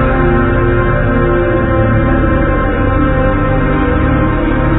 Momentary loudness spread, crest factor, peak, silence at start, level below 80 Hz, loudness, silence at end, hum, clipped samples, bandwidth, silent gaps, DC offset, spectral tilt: 2 LU; 10 dB; 0 dBFS; 0 s; -16 dBFS; -12 LUFS; 0 s; 50 Hz at -25 dBFS; under 0.1%; 4 kHz; none; under 0.1%; -12 dB/octave